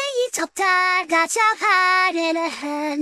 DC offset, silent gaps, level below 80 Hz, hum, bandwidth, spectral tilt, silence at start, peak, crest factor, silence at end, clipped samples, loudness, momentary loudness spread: under 0.1%; none; -72 dBFS; none; 15 kHz; 0 dB/octave; 0 s; -4 dBFS; 16 dB; 0 s; under 0.1%; -19 LUFS; 9 LU